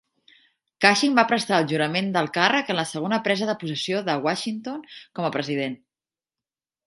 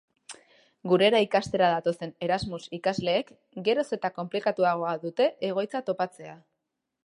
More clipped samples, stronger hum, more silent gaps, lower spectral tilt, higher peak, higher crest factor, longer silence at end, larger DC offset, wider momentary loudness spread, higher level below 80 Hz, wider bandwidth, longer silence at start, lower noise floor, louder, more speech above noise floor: neither; neither; neither; second, -4 dB/octave vs -5.5 dB/octave; first, 0 dBFS vs -8 dBFS; first, 24 dB vs 18 dB; first, 1.1 s vs 0.7 s; neither; second, 12 LU vs 19 LU; second, -72 dBFS vs -62 dBFS; about the same, 11.5 kHz vs 11.5 kHz; first, 0.8 s vs 0.3 s; first, under -90 dBFS vs -83 dBFS; first, -23 LUFS vs -27 LUFS; first, over 67 dB vs 56 dB